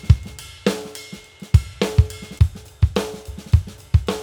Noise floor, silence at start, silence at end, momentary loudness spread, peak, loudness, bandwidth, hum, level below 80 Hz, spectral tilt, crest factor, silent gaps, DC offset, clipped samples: -39 dBFS; 0.05 s; 0 s; 16 LU; 0 dBFS; -21 LUFS; 16.5 kHz; none; -26 dBFS; -6.5 dB/octave; 20 dB; none; under 0.1%; under 0.1%